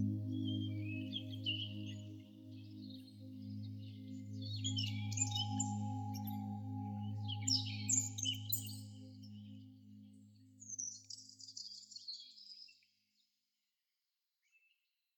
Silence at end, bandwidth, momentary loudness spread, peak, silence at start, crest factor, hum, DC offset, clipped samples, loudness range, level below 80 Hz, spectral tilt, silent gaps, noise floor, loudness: 2.45 s; 19 kHz; 19 LU; -20 dBFS; 0 s; 24 dB; none; under 0.1%; under 0.1%; 13 LU; -82 dBFS; -3 dB/octave; none; -89 dBFS; -41 LUFS